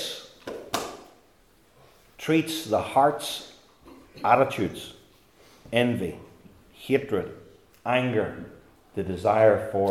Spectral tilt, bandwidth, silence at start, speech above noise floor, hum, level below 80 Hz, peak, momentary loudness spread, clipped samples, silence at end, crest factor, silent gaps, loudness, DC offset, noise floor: -5 dB/octave; 17.5 kHz; 0 s; 36 dB; none; -62 dBFS; -4 dBFS; 19 LU; under 0.1%; 0 s; 22 dB; none; -25 LUFS; under 0.1%; -60 dBFS